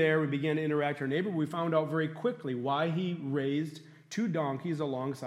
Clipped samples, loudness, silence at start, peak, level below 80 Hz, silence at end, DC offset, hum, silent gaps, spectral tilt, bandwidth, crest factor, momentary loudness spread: under 0.1%; -32 LUFS; 0 s; -14 dBFS; -80 dBFS; 0 s; under 0.1%; none; none; -7 dB/octave; 12.5 kHz; 16 dB; 5 LU